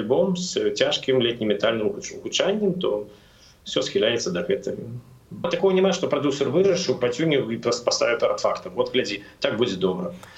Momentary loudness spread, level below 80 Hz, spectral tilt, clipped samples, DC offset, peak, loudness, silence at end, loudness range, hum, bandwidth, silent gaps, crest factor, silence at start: 10 LU; -58 dBFS; -4.5 dB/octave; under 0.1%; under 0.1%; -6 dBFS; -23 LUFS; 0 s; 3 LU; none; 8.4 kHz; none; 18 dB; 0 s